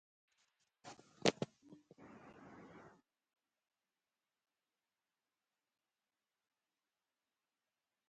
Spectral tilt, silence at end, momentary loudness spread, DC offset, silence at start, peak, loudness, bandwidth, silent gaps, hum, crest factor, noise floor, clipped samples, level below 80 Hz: -4 dB/octave; 5.3 s; 26 LU; under 0.1%; 0.85 s; -14 dBFS; -40 LUFS; 8.8 kHz; none; none; 38 dB; under -90 dBFS; under 0.1%; -86 dBFS